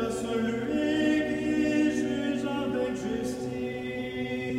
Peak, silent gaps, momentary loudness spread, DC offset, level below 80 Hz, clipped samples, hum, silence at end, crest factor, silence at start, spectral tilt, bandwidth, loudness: -14 dBFS; none; 8 LU; under 0.1%; -54 dBFS; under 0.1%; none; 0 s; 14 dB; 0 s; -5.5 dB/octave; 13.5 kHz; -29 LUFS